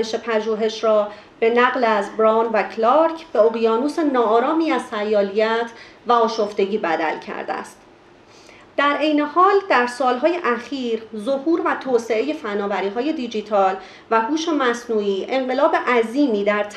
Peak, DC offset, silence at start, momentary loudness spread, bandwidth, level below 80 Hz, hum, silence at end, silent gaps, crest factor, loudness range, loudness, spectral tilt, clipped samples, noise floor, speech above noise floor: -2 dBFS; under 0.1%; 0 s; 8 LU; 10.5 kHz; -66 dBFS; none; 0 s; none; 18 dB; 4 LU; -19 LUFS; -4.5 dB/octave; under 0.1%; -48 dBFS; 29 dB